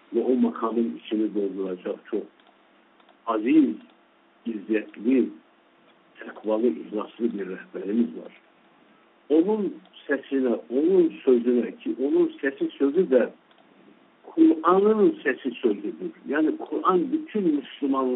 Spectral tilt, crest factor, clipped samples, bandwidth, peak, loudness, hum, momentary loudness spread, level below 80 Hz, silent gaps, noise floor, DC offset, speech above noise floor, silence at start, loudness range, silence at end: -5.5 dB/octave; 18 dB; under 0.1%; 4 kHz; -6 dBFS; -24 LUFS; none; 13 LU; -78 dBFS; none; -59 dBFS; under 0.1%; 36 dB; 0.1 s; 6 LU; 0 s